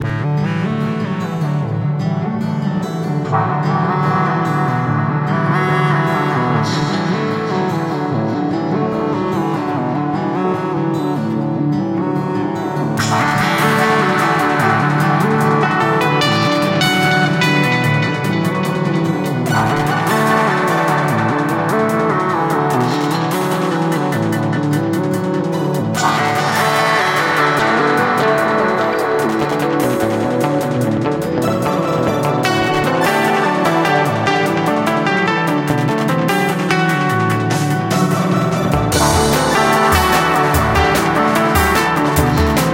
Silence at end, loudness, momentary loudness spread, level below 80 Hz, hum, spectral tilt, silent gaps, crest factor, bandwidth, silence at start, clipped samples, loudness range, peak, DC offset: 0 s; -15 LUFS; 5 LU; -36 dBFS; none; -5.5 dB/octave; none; 16 dB; 17 kHz; 0 s; under 0.1%; 4 LU; 0 dBFS; under 0.1%